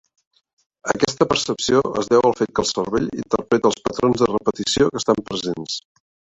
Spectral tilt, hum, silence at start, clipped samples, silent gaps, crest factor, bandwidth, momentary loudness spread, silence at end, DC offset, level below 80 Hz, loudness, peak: -4 dB/octave; none; 0.85 s; under 0.1%; none; 18 dB; 8.4 kHz; 8 LU; 0.6 s; under 0.1%; -50 dBFS; -20 LUFS; -2 dBFS